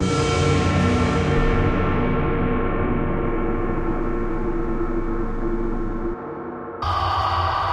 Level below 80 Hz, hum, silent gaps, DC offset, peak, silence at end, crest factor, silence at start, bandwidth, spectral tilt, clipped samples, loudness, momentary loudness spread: -26 dBFS; none; none; under 0.1%; -8 dBFS; 0 s; 14 dB; 0 s; 9.8 kHz; -6.5 dB/octave; under 0.1%; -23 LUFS; 8 LU